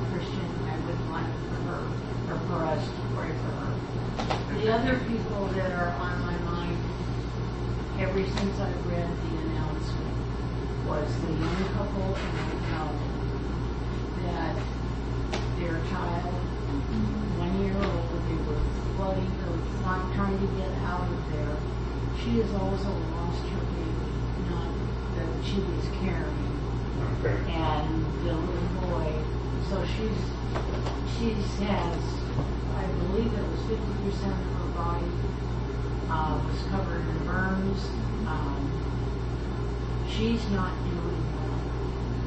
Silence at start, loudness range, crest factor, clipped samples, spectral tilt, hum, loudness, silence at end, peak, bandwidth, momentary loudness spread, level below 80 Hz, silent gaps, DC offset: 0 s; 2 LU; 16 dB; under 0.1%; -7.5 dB/octave; none; -30 LUFS; 0 s; -12 dBFS; 8.4 kHz; 4 LU; -34 dBFS; none; under 0.1%